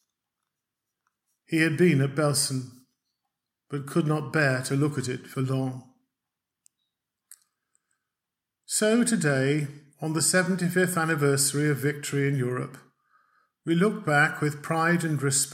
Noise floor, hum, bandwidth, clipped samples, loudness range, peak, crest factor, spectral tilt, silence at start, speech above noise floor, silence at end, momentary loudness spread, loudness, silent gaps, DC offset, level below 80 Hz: -87 dBFS; none; 16 kHz; under 0.1%; 8 LU; -8 dBFS; 20 dB; -4.5 dB/octave; 1.5 s; 62 dB; 0 s; 12 LU; -25 LUFS; none; under 0.1%; -74 dBFS